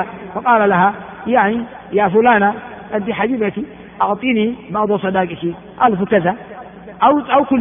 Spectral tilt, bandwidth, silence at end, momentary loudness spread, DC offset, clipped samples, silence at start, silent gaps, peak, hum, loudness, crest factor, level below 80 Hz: -4.5 dB/octave; 3.7 kHz; 0 s; 14 LU; under 0.1%; under 0.1%; 0 s; none; 0 dBFS; none; -16 LUFS; 16 dB; -52 dBFS